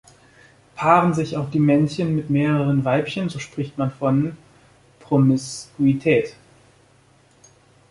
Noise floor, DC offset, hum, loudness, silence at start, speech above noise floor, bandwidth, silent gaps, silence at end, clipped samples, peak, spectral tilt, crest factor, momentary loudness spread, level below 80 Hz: -55 dBFS; under 0.1%; none; -20 LUFS; 0.75 s; 36 dB; 11.5 kHz; none; 1.6 s; under 0.1%; -2 dBFS; -7 dB/octave; 20 dB; 11 LU; -58 dBFS